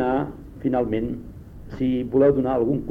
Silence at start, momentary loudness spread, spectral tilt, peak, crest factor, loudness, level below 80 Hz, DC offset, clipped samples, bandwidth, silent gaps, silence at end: 0 s; 19 LU; -10 dB/octave; -6 dBFS; 16 dB; -23 LUFS; -42 dBFS; under 0.1%; under 0.1%; 5 kHz; none; 0 s